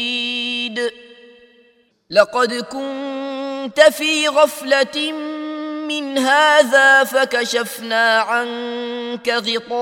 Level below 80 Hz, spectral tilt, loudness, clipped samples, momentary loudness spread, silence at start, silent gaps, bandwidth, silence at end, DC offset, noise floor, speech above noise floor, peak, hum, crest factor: -68 dBFS; -1.5 dB/octave; -17 LUFS; under 0.1%; 14 LU; 0 s; none; 17.5 kHz; 0 s; under 0.1%; -56 dBFS; 40 dB; 0 dBFS; none; 18 dB